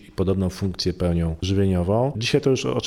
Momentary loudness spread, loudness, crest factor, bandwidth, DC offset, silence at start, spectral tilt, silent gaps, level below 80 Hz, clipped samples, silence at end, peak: 4 LU; -22 LUFS; 16 dB; 13.5 kHz; under 0.1%; 0.2 s; -6 dB/octave; none; -40 dBFS; under 0.1%; 0 s; -6 dBFS